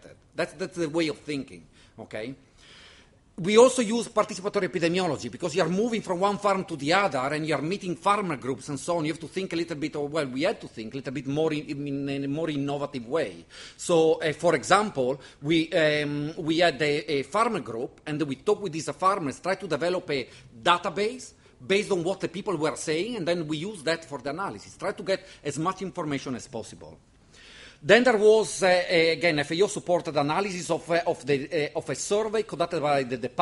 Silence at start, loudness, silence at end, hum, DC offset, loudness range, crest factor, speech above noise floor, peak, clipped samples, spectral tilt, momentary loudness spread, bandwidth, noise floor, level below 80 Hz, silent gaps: 0.05 s; -26 LUFS; 0 s; none; under 0.1%; 7 LU; 22 dB; 29 dB; -4 dBFS; under 0.1%; -4.5 dB/octave; 12 LU; 11.5 kHz; -56 dBFS; -62 dBFS; none